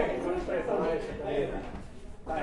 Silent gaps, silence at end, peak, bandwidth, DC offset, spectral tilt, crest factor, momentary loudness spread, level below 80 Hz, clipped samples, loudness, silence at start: none; 0 s; -14 dBFS; 11.5 kHz; under 0.1%; -6.5 dB/octave; 18 dB; 16 LU; -44 dBFS; under 0.1%; -32 LUFS; 0 s